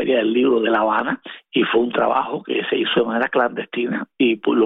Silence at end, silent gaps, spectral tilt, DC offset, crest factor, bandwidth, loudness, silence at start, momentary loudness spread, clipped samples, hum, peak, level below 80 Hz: 0 s; none; -8 dB/octave; under 0.1%; 14 dB; 4 kHz; -19 LUFS; 0 s; 7 LU; under 0.1%; none; -4 dBFS; -62 dBFS